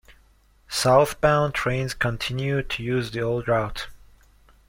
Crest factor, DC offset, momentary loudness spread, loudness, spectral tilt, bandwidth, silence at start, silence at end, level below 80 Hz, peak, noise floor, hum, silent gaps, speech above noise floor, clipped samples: 20 dB; under 0.1%; 10 LU; -23 LUFS; -5 dB/octave; 16.5 kHz; 0.1 s; 0.75 s; -44 dBFS; -4 dBFS; -58 dBFS; none; none; 35 dB; under 0.1%